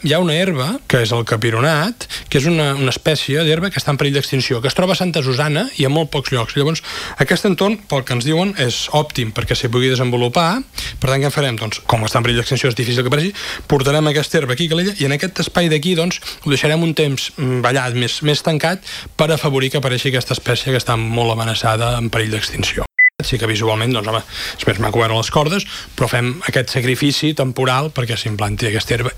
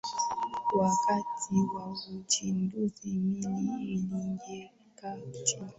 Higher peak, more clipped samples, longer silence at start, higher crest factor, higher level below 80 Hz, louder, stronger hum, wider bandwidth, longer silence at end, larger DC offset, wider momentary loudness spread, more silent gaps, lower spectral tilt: first, 0 dBFS vs -12 dBFS; neither; about the same, 0 s vs 0.05 s; about the same, 16 dB vs 20 dB; first, -40 dBFS vs -66 dBFS; first, -17 LUFS vs -32 LUFS; neither; first, 16.5 kHz vs 8.4 kHz; about the same, 0 s vs 0.05 s; neither; second, 5 LU vs 13 LU; neither; about the same, -5 dB/octave vs -4.5 dB/octave